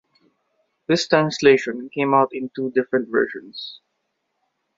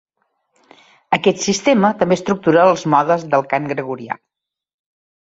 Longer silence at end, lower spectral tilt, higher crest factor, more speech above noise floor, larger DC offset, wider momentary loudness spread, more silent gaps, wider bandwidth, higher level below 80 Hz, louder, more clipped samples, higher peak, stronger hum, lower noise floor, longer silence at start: second, 1 s vs 1.15 s; about the same, -5 dB/octave vs -5 dB/octave; about the same, 20 dB vs 16 dB; about the same, 54 dB vs 53 dB; neither; first, 17 LU vs 12 LU; neither; about the same, 7.8 kHz vs 8 kHz; second, -64 dBFS vs -58 dBFS; second, -20 LUFS vs -16 LUFS; neither; about the same, -2 dBFS vs -2 dBFS; neither; first, -74 dBFS vs -69 dBFS; second, 0.9 s vs 1.1 s